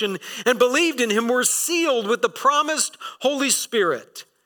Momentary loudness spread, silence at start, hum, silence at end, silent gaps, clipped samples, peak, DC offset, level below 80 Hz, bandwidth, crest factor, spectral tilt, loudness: 7 LU; 0 s; none; 0.25 s; none; under 0.1%; -6 dBFS; under 0.1%; -76 dBFS; 19 kHz; 16 dB; -1.5 dB/octave; -20 LUFS